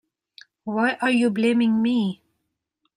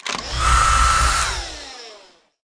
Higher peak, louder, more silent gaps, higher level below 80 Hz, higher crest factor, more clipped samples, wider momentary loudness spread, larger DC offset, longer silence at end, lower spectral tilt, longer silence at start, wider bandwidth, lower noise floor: second, -8 dBFS vs -4 dBFS; second, -22 LUFS vs -17 LUFS; neither; second, -70 dBFS vs -26 dBFS; about the same, 16 dB vs 16 dB; neither; second, 11 LU vs 19 LU; neither; first, 0.8 s vs 0.45 s; first, -6 dB/octave vs -2 dB/octave; first, 0.65 s vs 0.05 s; about the same, 10.5 kHz vs 10.5 kHz; first, -78 dBFS vs -49 dBFS